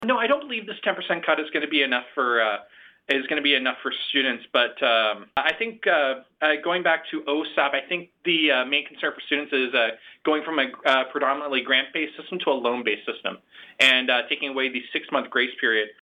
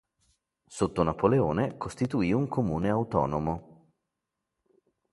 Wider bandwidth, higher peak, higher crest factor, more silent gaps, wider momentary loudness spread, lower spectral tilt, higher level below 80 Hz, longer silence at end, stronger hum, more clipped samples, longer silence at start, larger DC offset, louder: first, 14.5 kHz vs 11.5 kHz; about the same, -6 dBFS vs -8 dBFS; about the same, 18 dB vs 22 dB; neither; about the same, 8 LU vs 8 LU; second, -3 dB/octave vs -7.5 dB/octave; second, -72 dBFS vs -50 dBFS; second, 0.1 s vs 1.4 s; neither; neither; second, 0 s vs 0.7 s; neither; first, -23 LUFS vs -28 LUFS